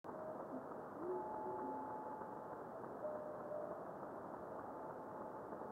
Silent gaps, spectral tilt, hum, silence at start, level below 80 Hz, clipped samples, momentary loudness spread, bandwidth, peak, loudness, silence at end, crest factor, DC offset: none; -8.5 dB/octave; none; 0.05 s; -80 dBFS; under 0.1%; 5 LU; 16.5 kHz; -34 dBFS; -49 LUFS; 0 s; 14 dB; under 0.1%